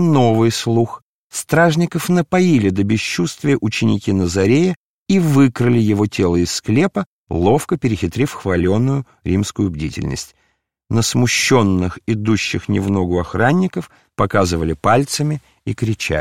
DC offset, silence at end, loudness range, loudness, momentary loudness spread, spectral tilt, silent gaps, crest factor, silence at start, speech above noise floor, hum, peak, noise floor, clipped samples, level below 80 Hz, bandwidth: 0.5%; 0 s; 3 LU; -17 LUFS; 9 LU; -5.5 dB/octave; 1.02-1.30 s, 4.76-5.06 s, 7.06-7.27 s; 16 dB; 0 s; 49 dB; none; -2 dBFS; -65 dBFS; under 0.1%; -44 dBFS; 16.5 kHz